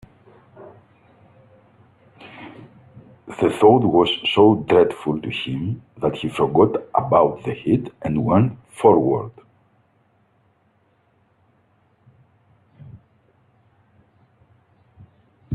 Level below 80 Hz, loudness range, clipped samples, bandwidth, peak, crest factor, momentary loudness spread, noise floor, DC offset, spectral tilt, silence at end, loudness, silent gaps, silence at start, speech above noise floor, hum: -56 dBFS; 6 LU; under 0.1%; 11.5 kHz; 0 dBFS; 20 dB; 13 LU; -62 dBFS; under 0.1%; -7.5 dB/octave; 0 s; -19 LUFS; none; 0.6 s; 44 dB; none